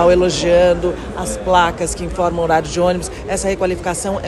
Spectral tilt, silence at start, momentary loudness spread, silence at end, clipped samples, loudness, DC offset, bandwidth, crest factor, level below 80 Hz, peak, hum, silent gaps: -4.5 dB/octave; 0 s; 9 LU; 0 s; under 0.1%; -17 LUFS; under 0.1%; 12.5 kHz; 14 dB; -32 dBFS; -2 dBFS; none; none